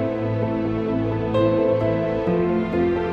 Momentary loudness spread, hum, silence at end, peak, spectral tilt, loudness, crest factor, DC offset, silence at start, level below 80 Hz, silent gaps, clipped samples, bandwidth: 4 LU; none; 0 s; -8 dBFS; -9.5 dB/octave; -22 LUFS; 14 dB; under 0.1%; 0 s; -42 dBFS; none; under 0.1%; 6.2 kHz